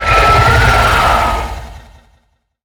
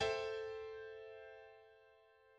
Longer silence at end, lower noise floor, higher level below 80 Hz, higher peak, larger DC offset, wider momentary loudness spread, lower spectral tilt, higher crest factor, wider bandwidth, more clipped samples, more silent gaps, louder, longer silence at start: first, 0.85 s vs 0 s; second, -58 dBFS vs -68 dBFS; first, -20 dBFS vs -72 dBFS; first, 0 dBFS vs -26 dBFS; neither; second, 14 LU vs 24 LU; first, -4.5 dB/octave vs -3 dB/octave; second, 12 dB vs 20 dB; first, over 20 kHz vs 9.4 kHz; neither; neither; first, -10 LUFS vs -46 LUFS; about the same, 0 s vs 0 s